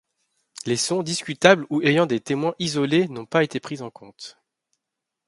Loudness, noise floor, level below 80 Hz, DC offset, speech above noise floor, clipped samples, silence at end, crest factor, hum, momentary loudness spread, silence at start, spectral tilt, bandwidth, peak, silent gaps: -21 LUFS; -84 dBFS; -66 dBFS; under 0.1%; 62 dB; under 0.1%; 0.95 s; 24 dB; none; 22 LU; 0.55 s; -4.5 dB/octave; 11.5 kHz; 0 dBFS; none